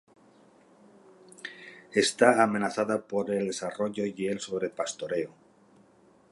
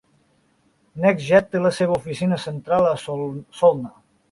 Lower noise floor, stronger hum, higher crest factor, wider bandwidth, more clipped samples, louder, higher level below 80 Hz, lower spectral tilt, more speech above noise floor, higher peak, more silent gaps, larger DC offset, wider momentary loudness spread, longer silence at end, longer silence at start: about the same, -60 dBFS vs -62 dBFS; neither; first, 24 dB vs 18 dB; about the same, 11.5 kHz vs 11.5 kHz; neither; second, -28 LUFS vs -21 LUFS; second, -74 dBFS vs -58 dBFS; second, -4 dB/octave vs -6.5 dB/octave; second, 33 dB vs 42 dB; second, -6 dBFS vs -2 dBFS; neither; neither; first, 20 LU vs 12 LU; first, 1.05 s vs 0.45 s; first, 1.45 s vs 0.95 s